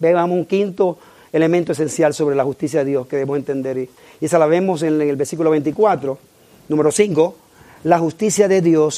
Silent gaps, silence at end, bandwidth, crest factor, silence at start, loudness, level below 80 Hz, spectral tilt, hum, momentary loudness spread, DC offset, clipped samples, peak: none; 0 s; 15.5 kHz; 16 dB; 0 s; -18 LUFS; -62 dBFS; -5.5 dB/octave; none; 9 LU; under 0.1%; under 0.1%; 0 dBFS